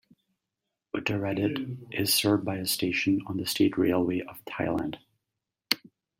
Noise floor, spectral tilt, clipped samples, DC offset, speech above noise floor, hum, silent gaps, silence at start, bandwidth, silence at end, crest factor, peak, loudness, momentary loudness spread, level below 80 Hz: -86 dBFS; -4 dB/octave; under 0.1%; under 0.1%; 58 dB; none; none; 0.95 s; 16.5 kHz; 0.45 s; 26 dB; -4 dBFS; -28 LUFS; 11 LU; -64 dBFS